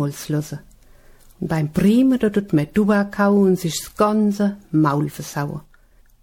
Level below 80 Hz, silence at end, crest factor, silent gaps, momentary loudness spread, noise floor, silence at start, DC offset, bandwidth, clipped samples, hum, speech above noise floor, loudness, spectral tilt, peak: -48 dBFS; 0.6 s; 16 dB; none; 11 LU; -52 dBFS; 0 s; under 0.1%; 17.5 kHz; under 0.1%; none; 33 dB; -19 LUFS; -6.5 dB/octave; -4 dBFS